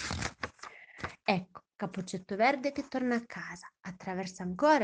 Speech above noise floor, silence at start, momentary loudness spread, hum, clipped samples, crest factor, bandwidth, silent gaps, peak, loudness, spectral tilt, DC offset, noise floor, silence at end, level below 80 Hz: 19 dB; 0 s; 16 LU; none; under 0.1%; 22 dB; 10 kHz; none; -12 dBFS; -34 LUFS; -5 dB/octave; under 0.1%; -51 dBFS; 0 s; -62 dBFS